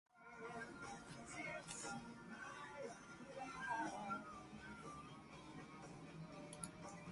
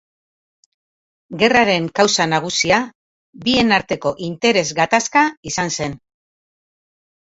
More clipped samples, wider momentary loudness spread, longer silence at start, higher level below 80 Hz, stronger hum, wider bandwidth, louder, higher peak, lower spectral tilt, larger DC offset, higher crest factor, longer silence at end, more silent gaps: neither; about the same, 10 LU vs 9 LU; second, 0.15 s vs 1.3 s; second, -74 dBFS vs -52 dBFS; neither; first, 11.5 kHz vs 8 kHz; second, -52 LUFS vs -17 LUFS; second, -30 dBFS vs 0 dBFS; about the same, -4 dB/octave vs -3 dB/octave; neither; about the same, 22 dB vs 20 dB; second, 0 s vs 1.45 s; second, none vs 2.95-3.33 s, 5.37-5.43 s